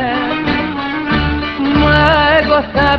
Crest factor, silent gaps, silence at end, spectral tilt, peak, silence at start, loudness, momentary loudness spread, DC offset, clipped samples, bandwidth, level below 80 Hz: 12 dB; none; 0 s; -7.5 dB/octave; 0 dBFS; 0 s; -13 LUFS; 8 LU; under 0.1%; under 0.1%; 8 kHz; -26 dBFS